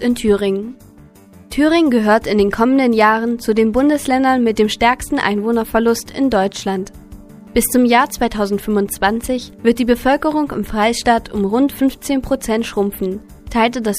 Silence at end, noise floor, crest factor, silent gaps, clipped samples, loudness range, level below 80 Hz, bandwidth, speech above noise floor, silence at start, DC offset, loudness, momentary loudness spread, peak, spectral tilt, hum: 0 s; -43 dBFS; 16 dB; none; under 0.1%; 3 LU; -38 dBFS; 15.5 kHz; 27 dB; 0 s; under 0.1%; -16 LUFS; 8 LU; 0 dBFS; -4.5 dB/octave; none